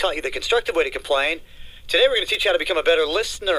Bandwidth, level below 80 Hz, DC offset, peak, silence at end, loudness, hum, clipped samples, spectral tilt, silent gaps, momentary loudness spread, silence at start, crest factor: 15.5 kHz; -42 dBFS; under 0.1%; -6 dBFS; 0 s; -20 LUFS; none; under 0.1%; -1.5 dB/octave; none; 6 LU; 0 s; 16 dB